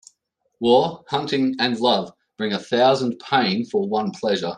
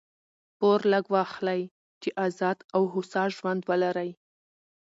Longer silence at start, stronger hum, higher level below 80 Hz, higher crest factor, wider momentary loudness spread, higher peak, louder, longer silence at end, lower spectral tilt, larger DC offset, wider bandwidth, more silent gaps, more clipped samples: about the same, 0.6 s vs 0.6 s; neither; first, -66 dBFS vs -78 dBFS; about the same, 18 dB vs 16 dB; about the same, 8 LU vs 10 LU; first, -4 dBFS vs -12 dBFS; first, -21 LUFS vs -27 LUFS; second, 0 s vs 0.75 s; about the same, -5.5 dB/octave vs -6.5 dB/octave; neither; first, 10 kHz vs 8 kHz; second, none vs 1.71-2.01 s, 2.64-2.69 s; neither